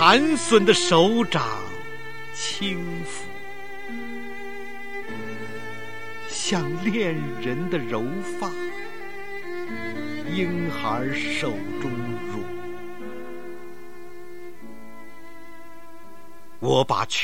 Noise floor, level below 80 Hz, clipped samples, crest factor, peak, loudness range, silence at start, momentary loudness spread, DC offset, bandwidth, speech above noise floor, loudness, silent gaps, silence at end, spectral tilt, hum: -48 dBFS; -60 dBFS; under 0.1%; 26 dB; 0 dBFS; 14 LU; 0 s; 24 LU; 2%; 16 kHz; 25 dB; -25 LUFS; none; 0 s; -4 dB/octave; none